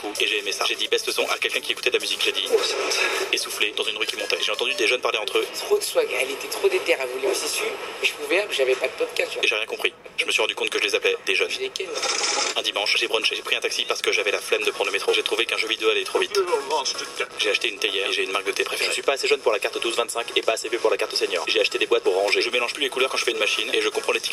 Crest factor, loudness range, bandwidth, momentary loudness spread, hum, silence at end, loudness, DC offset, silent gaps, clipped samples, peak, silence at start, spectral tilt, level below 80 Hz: 22 dB; 1 LU; 16 kHz; 4 LU; none; 0 s; -22 LUFS; under 0.1%; none; under 0.1%; -2 dBFS; 0 s; 0 dB/octave; -68 dBFS